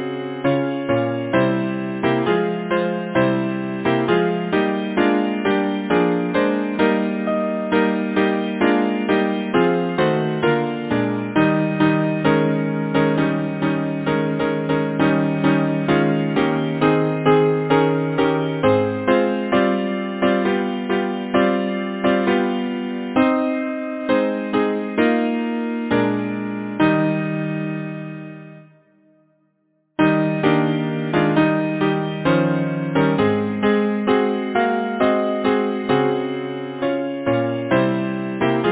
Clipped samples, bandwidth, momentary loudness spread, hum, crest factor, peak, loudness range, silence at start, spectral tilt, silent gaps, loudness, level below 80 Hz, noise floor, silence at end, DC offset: under 0.1%; 4 kHz; 6 LU; none; 18 dB; -2 dBFS; 3 LU; 0 s; -11 dB/octave; none; -20 LUFS; -54 dBFS; -66 dBFS; 0 s; under 0.1%